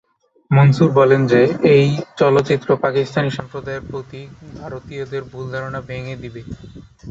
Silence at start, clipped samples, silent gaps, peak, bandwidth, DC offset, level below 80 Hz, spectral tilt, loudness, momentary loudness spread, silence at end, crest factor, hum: 0.5 s; under 0.1%; none; -2 dBFS; 7.8 kHz; under 0.1%; -48 dBFS; -8 dB/octave; -16 LUFS; 21 LU; 0 s; 16 dB; none